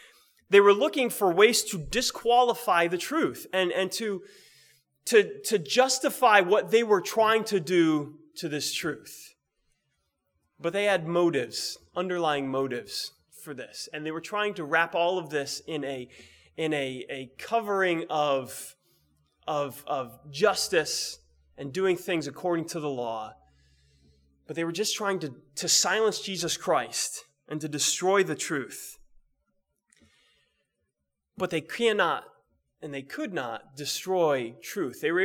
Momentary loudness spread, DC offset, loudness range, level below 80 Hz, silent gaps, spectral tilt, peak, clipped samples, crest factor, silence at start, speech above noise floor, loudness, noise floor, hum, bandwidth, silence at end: 16 LU; under 0.1%; 8 LU; -64 dBFS; none; -3 dB/octave; -4 dBFS; under 0.1%; 24 dB; 0.5 s; 55 dB; -27 LUFS; -82 dBFS; none; 20 kHz; 0 s